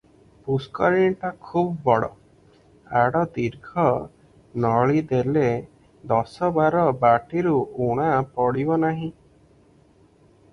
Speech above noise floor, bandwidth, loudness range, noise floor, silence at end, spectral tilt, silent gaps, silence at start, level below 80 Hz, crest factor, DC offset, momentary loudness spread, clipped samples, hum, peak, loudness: 34 dB; 10.5 kHz; 3 LU; -56 dBFS; 1.4 s; -8.5 dB/octave; none; 0.45 s; -54 dBFS; 18 dB; under 0.1%; 9 LU; under 0.1%; none; -4 dBFS; -22 LUFS